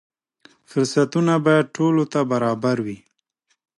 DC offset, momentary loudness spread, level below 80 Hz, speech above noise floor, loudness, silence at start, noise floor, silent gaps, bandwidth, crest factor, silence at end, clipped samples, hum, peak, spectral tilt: under 0.1%; 9 LU; -66 dBFS; 51 dB; -20 LUFS; 0.75 s; -71 dBFS; none; 11.5 kHz; 16 dB; 0.8 s; under 0.1%; none; -4 dBFS; -6.5 dB/octave